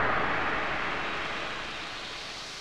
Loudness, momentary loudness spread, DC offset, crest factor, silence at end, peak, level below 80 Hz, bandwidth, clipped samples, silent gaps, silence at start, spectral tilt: -31 LUFS; 9 LU; under 0.1%; 16 dB; 0 s; -14 dBFS; -52 dBFS; 15 kHz; under 0.1%; none; 0 s; -3.5 dB/octave